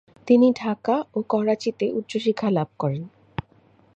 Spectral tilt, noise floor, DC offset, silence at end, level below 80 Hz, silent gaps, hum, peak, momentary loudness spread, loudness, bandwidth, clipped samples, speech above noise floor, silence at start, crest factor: -7.5 dB/octave; -57 dBFS; under 0.1%; 0.55 s; -58 dBFS; none; none; -4 dBFS; 17 LU; -23 LUFS; 8.2 kHz; under 0.1%; 35 dB; 0.25 s; 18 dB